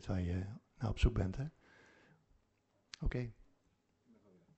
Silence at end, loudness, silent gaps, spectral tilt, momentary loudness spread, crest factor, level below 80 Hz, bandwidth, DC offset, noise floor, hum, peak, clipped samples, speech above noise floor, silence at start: 1.25 s; -40 LUFS; none; -7 dB/octave; 13 LU; 22 dB; -46 dBFS; 8.2 kHz; under 0.1%; -78 dBFS; none; -20 dBFS; under 0.1%; 41 dB; 0 s